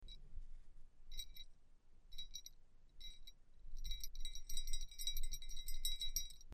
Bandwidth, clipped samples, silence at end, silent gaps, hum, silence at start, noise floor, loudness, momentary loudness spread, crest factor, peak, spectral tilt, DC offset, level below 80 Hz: 14.5 kHz; under 0.1%; 0 s; none; none; 0 s; -62 dBFS; -48 LUFS; 18 LU; 18 dB; -24 dBFS; 0 dB/octave; under 0.1%; -48 dBFS